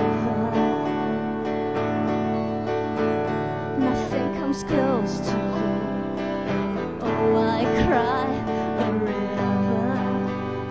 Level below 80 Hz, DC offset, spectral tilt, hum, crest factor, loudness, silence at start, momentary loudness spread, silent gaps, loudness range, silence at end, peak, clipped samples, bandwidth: -46 dBFS; 0.3%; -7 dB/octave; none; 16 dB; -24 LUFS; 0 s; 6 LU; none; 2 LU; 0 s; -8 dBFS; under 0.1%; 8 kHz